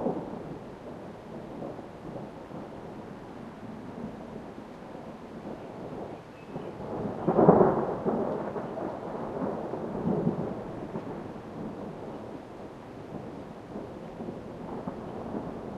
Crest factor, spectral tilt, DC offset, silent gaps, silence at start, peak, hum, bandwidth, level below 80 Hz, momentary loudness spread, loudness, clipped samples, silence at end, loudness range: 28 dB; -9 dB/octave; under 0.1%; none; 0 s; -4 dBFS; none; 12 kHz; -58 dBFS; 14 LU; -33 LUFS; under 0.1%; 0 s; 14 LU